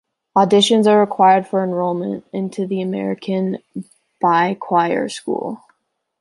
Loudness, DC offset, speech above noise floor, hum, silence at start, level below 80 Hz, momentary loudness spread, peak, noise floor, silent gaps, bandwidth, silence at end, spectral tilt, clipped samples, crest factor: -17 LUFS; under 0.1%; 50 dB; none; 0.35 s; -66 dBFS; 13 LU; -2 dBFS; -67 dBFS; none; 11.5 kHz; 0.65 s; -5.5 dB/octave; under 0.1%; 16 dB